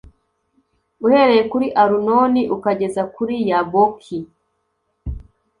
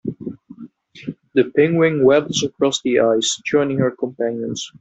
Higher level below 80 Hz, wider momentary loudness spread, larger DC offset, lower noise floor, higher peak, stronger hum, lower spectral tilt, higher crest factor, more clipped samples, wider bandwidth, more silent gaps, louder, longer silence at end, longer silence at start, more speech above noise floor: first, -42 dBFS vs -60 dBFS; about the same, 19 LU vs 18 LU; neither; first, -70 dBFS vs -40 dBFS; about the same, -2 dBFS vs -2 dBFS; neither; first, -7 dB/octave vs -4.5 dB/octave; about the same, 16 dB vs 16 dB; neither; first, 11 kHz vs 8.4 kHz; neither; about the same, -17 LUFS vs -18 LUFS; first, 0.4 s vs 0.15 s; first, 1 s vs 0.05 s; first, 54 dB vs 23 dB